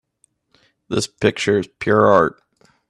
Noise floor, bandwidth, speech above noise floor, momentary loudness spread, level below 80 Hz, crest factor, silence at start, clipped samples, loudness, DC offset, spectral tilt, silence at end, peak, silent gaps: -64 dBFS; 12.5 kHz; 47 dB; 10 LU; -54 dBFS; 20 dB; 0.9 s; under 0.1%; -18 LUFS; under 0.1%; -5 dB/octave; 0.6 s; 0 dBFS; none